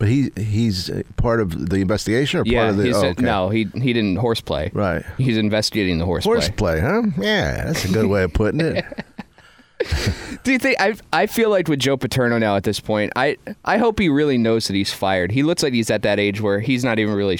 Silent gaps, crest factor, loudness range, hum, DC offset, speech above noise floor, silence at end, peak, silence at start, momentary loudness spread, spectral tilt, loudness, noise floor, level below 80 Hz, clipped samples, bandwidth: none; 14 dB; 2 LU; none; under 0.1%; 31 dB; 0 s; -4 dBFS; 0 s; 5 LU; -5.5 dB/octave; -19 LUFS; -50 dBFS; -36 dBFS; under 0.1%; 17.5 kHz